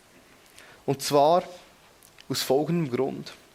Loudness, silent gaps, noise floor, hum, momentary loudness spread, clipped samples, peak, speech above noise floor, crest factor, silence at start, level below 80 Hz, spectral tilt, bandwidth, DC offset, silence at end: -25 LUFS; none; -55 dBFS; none; 15 LU; under 0.1%; -8 dBFS; 30 dB; 20 dB; 0.85 s; -68 dBFS; -5 dB/octave; 16.5 kHz; under 0.1%; 0.2 s